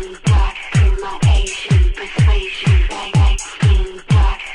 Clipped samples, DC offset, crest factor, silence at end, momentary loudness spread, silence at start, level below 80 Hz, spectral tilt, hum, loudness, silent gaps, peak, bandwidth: under 0.1%; under 0.1%; 12 dB; 0 s; 3 LU; 0 s; -18 dBFS; -5.5 dB/octave; none; -16 LUFS; none; -2 dBFS; 10.5 kHz